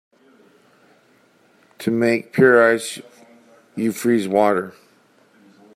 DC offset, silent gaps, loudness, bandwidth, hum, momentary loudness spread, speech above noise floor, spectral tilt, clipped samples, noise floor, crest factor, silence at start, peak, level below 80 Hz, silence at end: under 0.1%; none; -18 LUFS; 15.5 kHz; none; 19 LU; 39 dB; -5.5 dB/octave; under 0.1%; -57 dBFS; 20 dB; 1.8 s; -2 dBFS; -68 dBFS; 1.05 s